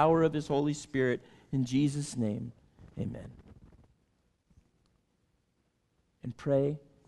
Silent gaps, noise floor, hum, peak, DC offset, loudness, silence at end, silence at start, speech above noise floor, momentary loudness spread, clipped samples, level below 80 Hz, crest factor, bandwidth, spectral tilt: none; -75 dBFS; none; -12 dBFS; under 0.1%; -32 LUFS; 0.3 s; 0 s; 45 dB; 17 LU; under 0.1%; -60 dBFS; 22 dB; 12 kHz; -6.5 dB/octave